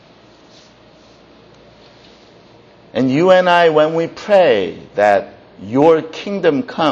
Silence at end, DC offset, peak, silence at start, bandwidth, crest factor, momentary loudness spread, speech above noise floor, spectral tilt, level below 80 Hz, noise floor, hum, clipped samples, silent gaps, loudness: 0 s; under 0.1%; 0 dBFS; 2.95 s; 8 kHz; 16 dB; 12 LU; 32 dB; -6 dB/octave; -58 dBFS; -45 dBFS; none; under 0.1%; none; -14 LUFS